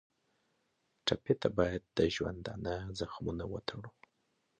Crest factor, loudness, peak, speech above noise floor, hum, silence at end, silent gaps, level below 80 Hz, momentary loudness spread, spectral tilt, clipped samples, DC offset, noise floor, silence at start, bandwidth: 22 dB; -36 LUFS; -14 dBFS; 43 dB; none; 0.7 s; none; -54 dBFS; 9 LU; -5.5 dB/octave; under 0.1%; under 0.1%; -79 dBFS; 1.05 s; 9 kHz